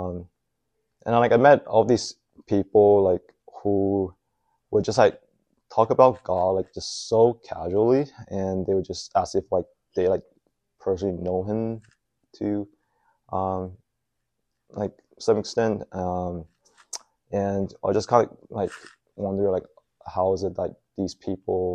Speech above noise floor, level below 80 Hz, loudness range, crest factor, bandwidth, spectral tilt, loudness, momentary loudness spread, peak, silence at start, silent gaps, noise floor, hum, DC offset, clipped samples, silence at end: 57 dB; -56 dBFS; 9 LU; 22 dB; 10 kHz; -6 dB/octave; -24 LUFS; 14 LU; -2 dBFS; 0 s; none; -80 dBFS; none; under 0.1%; under 0.1%; 0 s